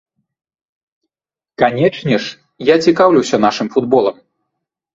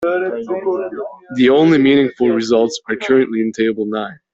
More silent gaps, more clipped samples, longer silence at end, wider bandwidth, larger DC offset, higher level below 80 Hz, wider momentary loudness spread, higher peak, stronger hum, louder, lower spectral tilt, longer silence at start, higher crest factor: neither; neither; first, 0.85 s vs 0.2 s; about the same, 7.8 kHz vs 8 kHz; neither; about the same, -56 dBFS vs -58 dBFS; second, 8 LU vs 11 LU; about the same, 0 dBFS vs -2 dBFS; neither; about the same, -14 LUFS vs -16 LUFS; about the same, -5.5 dB/octave vs -5.5 dB/octave; first, 1.6 s vs 0 s; about the same, 16 dB vs 12 dB